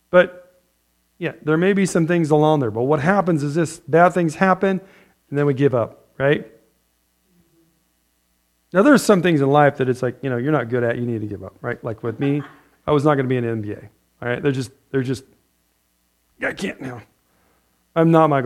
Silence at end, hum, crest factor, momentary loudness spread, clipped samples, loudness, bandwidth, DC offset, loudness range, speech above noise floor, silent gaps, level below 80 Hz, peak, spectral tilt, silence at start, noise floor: 0 s; none; 20 dB; 14 LU; under 0.1%; -19 LUFS; 15 kHz; under 0.1%; 9 LU; 47 dB; none; -58 dBFS; 0 dBFS; -7 dB/octave; 0.15 s; -66 dBFS